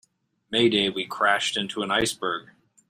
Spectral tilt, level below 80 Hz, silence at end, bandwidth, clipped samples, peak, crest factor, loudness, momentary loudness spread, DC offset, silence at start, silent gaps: -3 dB/octave; -58 dBFS; 0.45 s; 16 kHz; under 0.1%; -6 dBFS; 20 dB; -24 LUFS; 8 LU; under 0.1%; 0.5 s; none